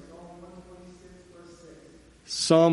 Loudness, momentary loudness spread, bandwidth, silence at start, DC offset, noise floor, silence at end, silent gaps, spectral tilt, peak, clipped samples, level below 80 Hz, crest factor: -24 LUFS; 28 LU; 11.5 kHz; 0.2 s; under 0.1%; -53 dBFS; 0 s; none; -5 dB/octave; -8 dBFS; under 0.1%; -60 dBFS; 22 dB